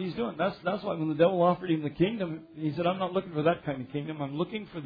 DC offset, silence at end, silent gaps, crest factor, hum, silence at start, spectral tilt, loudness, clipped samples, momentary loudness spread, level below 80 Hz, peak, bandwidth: under 0.1%; 0 s; none; 18 dB; none; 0 s; -10 dB/octave; -30 LUFS; under 0.1%; 9 LU; -62 dBFS; -12 dBFS; 5 kHz